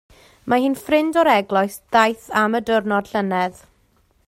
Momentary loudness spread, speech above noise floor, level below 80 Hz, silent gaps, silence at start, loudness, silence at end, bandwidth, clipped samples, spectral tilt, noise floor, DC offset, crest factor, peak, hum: 6 LU; 41 dB; -56 dBFS; none; 0.45 s; -19 LUFS; 0.75 s; 16 kHz; under 0.1%; -5 dB/octave; -60 dBFS; under 0.1%; 18 dB; -2 dBFS; none